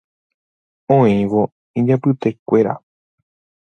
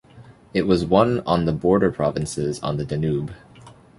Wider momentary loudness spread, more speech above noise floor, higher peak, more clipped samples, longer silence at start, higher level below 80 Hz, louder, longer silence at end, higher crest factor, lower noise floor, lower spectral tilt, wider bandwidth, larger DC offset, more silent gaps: about the same, 7 LU vs 8 LU; first, over 75 dB vs 26 dB; about the same, 0 dBFS vs -2 dBFS; neither; first, 0.9 s vs 0.15 s; second, -56 dBFS vs -44 dBFS; first, -17 LUFS vs -21 LUFS; first, 0.85 s vs 0.25 s; about the same, 18 dB vs 20 dB; first, under -90 dBFS vs -47 dBFS; first, -9.5 dB/octave vs -7 dB/octave; second, 6.6 kHz vs 11.5 kHz; neither; first, 1.52-1.74 s, 2.39-2.46 s vs none